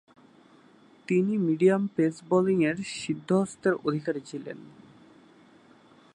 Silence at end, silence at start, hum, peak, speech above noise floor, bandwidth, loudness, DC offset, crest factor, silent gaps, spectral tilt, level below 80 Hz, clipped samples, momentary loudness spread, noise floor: 1.5 s; 1.1 s; none; -10 dBFS; 31 dB; 10 kHz; -26 LUFS; under 0.1%; 18 dB; none; -6.5 dB/octave; -72 dBFS; under 0.1%; 16 LU; -57 dBFS